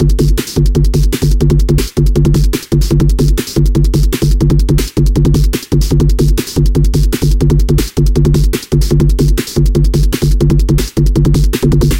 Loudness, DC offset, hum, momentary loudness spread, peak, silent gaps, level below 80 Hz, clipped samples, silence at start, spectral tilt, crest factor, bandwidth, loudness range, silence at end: -12 LUFS; under 0.1%; none; 2 LU; 0 dBFS; none; -12 dBFS; under 0.1%; 0 s; -6.5 dB/octave; 10 dB; 16.5 kHz; 0 LU; 0 s